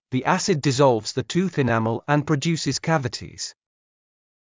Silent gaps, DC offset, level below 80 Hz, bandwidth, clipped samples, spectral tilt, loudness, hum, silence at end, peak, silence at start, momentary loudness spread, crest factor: none; under 0.1%; -56 dBFS; 7.8 kHz; under 0.1%; -5 dB/octave; -22 LUFS; none; 0.9 s; -6 dBFS; 0.1 s; 12 LU; 18 dB